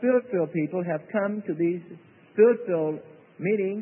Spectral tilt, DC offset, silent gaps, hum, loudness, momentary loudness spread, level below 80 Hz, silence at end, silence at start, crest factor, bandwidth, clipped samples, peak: -12.5 dB/octave; under 0.1%; none; none; -26 LUFS; 12 LU; -78 dBFS; 0 s; 0 s; 18 dB; 3.1 kHz; under 0.1%; -8 dBFS